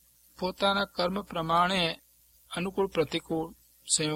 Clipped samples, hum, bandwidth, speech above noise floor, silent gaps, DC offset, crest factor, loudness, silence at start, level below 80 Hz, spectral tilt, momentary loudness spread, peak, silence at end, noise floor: under 0.1%; none; 16.5 kHz; 31 dB; none; under 0.1%; 20 dB; -29 LUFS; 0.4 s; -58 dBFS; -3.5 dB/octave; 12 LU; -12 dBFS; 0 s; -60 dBFS